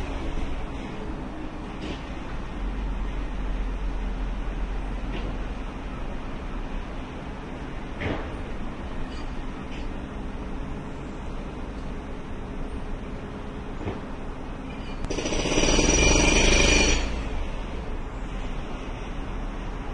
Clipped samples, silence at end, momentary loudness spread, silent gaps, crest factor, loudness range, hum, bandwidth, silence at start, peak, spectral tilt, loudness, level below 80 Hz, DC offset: under 0.1%; 0 s; 16 LU; none; 22 dB; 14 LU; none; 10.5 kHz; 0 s; -6 dBFS; -3.5 dB/octave; -29 LUFS; -30 dBFS; under 0.1%